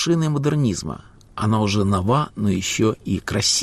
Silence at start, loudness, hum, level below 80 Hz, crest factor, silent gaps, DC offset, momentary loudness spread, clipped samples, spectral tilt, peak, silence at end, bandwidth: 0 s; -21 LUFS; none; -46 dBFS; 14 dB; none; under 0.1%; 9 LU; under 0.1%; -5 dB/octave; -8 dBFS; 0 s; 14.5 kHz